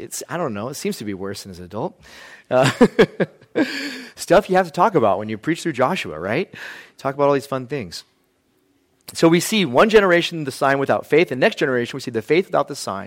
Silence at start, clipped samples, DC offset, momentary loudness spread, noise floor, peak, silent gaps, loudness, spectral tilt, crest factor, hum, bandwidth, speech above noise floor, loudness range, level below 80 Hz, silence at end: 0 s; under 0.1%; under 0.1%; 14 LU; -63 dBFS; -2 dBFS; none; -19 LUFS; -5 dB/octave; 18 dB; none; 16.5 kHz; 44 dB; 6 LU; -52 dBFS; 0 s